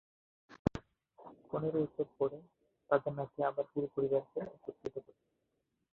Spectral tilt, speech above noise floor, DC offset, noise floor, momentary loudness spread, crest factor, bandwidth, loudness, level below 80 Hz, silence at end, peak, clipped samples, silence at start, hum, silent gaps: -7.5 dB/octave; 46 dB; under 0.1%; -83 dBFS; 15 LU; 28 dB; 4.2 kHz; -37 LUFS; -62 dBFS; 0.95 s; -12 dBFS; under 0.1%; 0.5 s; none; 0.59-0.65 s